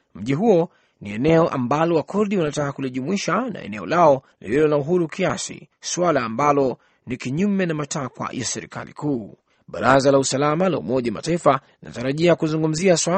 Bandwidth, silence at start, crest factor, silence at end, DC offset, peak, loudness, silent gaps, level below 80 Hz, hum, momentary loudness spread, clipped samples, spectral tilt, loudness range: 8.8 kHz; 0.15 s; 20 dB; 0 s; under 0.1%; 0 dBFS; -21 LUFS; none; -54 dBFS; none; 12 LU; under 0.1%; -5 dB/octave; 3 LU